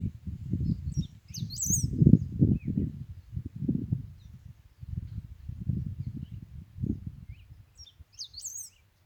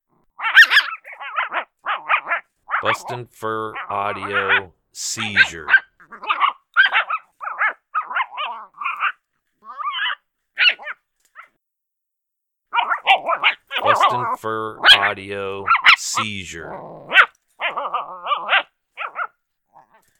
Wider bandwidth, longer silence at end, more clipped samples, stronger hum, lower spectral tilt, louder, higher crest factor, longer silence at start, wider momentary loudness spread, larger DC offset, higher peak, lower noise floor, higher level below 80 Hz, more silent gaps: about the same, over 20 kHz vs 19 kHz; second, 0.35 s vs 0.95 s; neither; neither; first, -6.5 dB/octave vs -1 dB/octave; second, -31 LUFS vs -18 LUFS; first, 28 dB vs 20 dB; second, 0 s vs 0.4 s; first, 25 LU vs 18 LU; neither; second, -4 dBFS vs 0 dBFS; second, -53 dBFS vs -80 dBFS; first, -44 dBFS vs -62 dBFS; neither